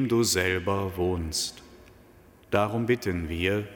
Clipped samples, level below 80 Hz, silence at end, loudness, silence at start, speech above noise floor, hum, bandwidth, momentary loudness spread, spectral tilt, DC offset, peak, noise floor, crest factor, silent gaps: under 0.1%; -48 dBFS; 0 s; -27 LUFS; 0 s; 28 dB; none; 17.5 kHz; 6 LU; -4.5 dB/octave; under 0.1%; -8 dBFS; -54 dBFS; 18 dB; none